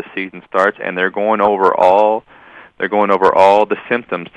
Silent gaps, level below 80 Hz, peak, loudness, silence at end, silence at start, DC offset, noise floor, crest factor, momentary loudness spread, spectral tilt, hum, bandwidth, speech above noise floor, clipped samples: none; -56 dBFS; 0 dBFS; -14 LUFS; 0.1 s; 0 s; under 0.1%; -39 dBFS; 14 dB; 11 LU; -6 dB/octave; none; 10.5 kHz; 26 dB; under 0.1%